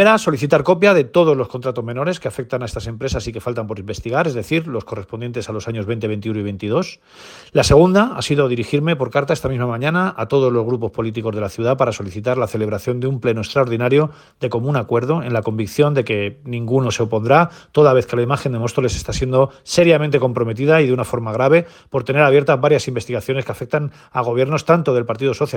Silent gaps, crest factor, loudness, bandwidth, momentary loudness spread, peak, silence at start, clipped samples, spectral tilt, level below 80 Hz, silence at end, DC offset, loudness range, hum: none; 18 dB; -18 LUFS; 18 kHz; 11 LU; 0 dBFS; 0 s; under 0.1%; -6 dB/octave; -42 dBFS; 0 s; under 0.1%; 7 LU; none